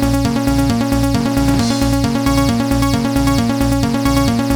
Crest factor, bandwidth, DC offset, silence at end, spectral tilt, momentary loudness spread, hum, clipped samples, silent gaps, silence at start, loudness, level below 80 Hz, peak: 14 dB; over 20 kHz; under 0.1%; 0 s; -5.5 dB/octave; 1 LU; none; under 0.1%; none; 0 s; -15 LUFS; -24 dBFS; 0 dBFS